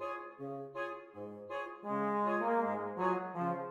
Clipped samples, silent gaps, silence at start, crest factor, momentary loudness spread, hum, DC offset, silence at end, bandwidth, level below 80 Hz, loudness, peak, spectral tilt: under 0.1%; none; 0 s; 16 dB; 12 LU; none; under 0.1%; 0 s; 11 kHz; -84 dBFS; -37 LUFS; -20 dBFS; -8 dB/octave